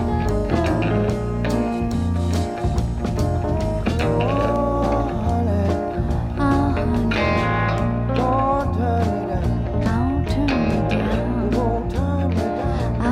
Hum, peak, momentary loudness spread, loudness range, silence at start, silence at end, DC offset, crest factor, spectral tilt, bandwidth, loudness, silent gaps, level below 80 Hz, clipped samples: none; -6 dBFS; 4 LU; 2 LU; 0 s; 0 s; under 0.1%; 14 dB; -7.5 dB/octave; 12 kHz; -21 LUFS; none; -28 dBFS; under 0.1%